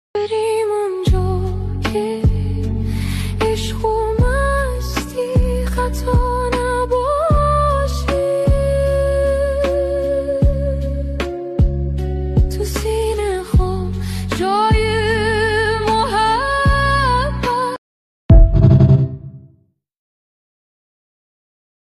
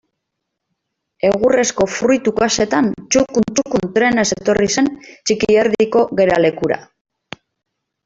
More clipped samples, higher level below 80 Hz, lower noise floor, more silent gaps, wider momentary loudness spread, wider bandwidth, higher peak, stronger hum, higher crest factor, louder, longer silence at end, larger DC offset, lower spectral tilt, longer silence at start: neither; first, -22 dBFS vs -48 dBFS; second, -55 dBFS vs -77 dBFS; first, 17.78-18.29 s vs none; about the same, 8 LU vs 6 LU; first, 14 kHz vs 8 kHz; about the same, 0 dBFS vs -2 dBFS; neither; about the same, 16 dB vs 14 dB; about the same, -17 LUFS vs -16 LUFS; first, 2.45 s vs 1.2 s; neither; first, -6.5 dB/octave vs -4 dB/octave; second, 0.15 s vs 1.25 s